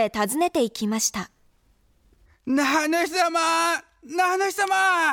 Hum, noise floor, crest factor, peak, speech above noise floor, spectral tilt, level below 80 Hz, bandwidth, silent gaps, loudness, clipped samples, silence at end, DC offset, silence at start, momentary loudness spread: none; -62 dBFS; 14 dB; -10 dBFS; 39 dB; -2.5 dB/octave; -62 dBFS; 19 kHz; none; -22 LUFS; under 0.1%; 0 s; under 0.1%; 0 s; 9 LU